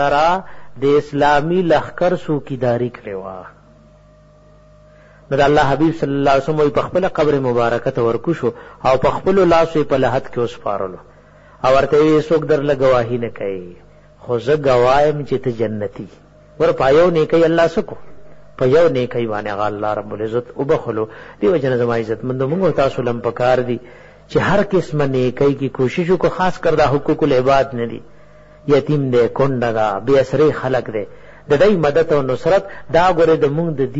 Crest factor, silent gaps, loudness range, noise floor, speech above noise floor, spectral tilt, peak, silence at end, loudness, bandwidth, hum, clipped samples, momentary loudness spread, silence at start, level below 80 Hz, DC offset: 14 dB; none; 3 LU; -47 dBFS; 31 dB; -7 dB/octave; -2 dBFS; 0 s; -16 LUFS; 8 kHz; none; under 0.1%; 10 LU; 0 s; -40 dBFS; under 0.1%